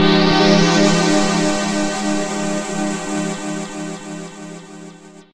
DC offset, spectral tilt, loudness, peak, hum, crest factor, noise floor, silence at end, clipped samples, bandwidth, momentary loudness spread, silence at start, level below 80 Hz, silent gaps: under 0.1%; -4.5 dB/octave; -17 LUFS; 0 dBFS; none; 16 dB; -39 dBFS; 0 s; under 0.1%; 12 kHz; 20 LU; 0 s; -46 dBFS; none